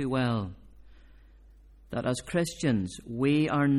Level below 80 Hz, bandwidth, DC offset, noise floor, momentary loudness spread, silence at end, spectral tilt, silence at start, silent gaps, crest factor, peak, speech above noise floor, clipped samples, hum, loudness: -54 dBFS; 13.5 kHz; under 0.1%; -54 dBFS; 11 LU; 0 s; -6 dB/octave; 0 s; none; 16 dB; -14 dBFS; 27 dB; under 0.1%; none; -29 LUFS